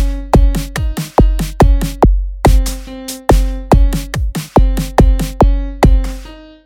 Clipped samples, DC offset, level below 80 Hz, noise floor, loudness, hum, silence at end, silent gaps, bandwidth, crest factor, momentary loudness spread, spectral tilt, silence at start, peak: under 0.1%; under 0.1%; -14 dBFS; -31 dBFS; -14 LUFS; none; 0.25 s; none; 16 kHz; 12 dB; 8 LU; -6.5 dB/octave; 0 s; 0 dBFS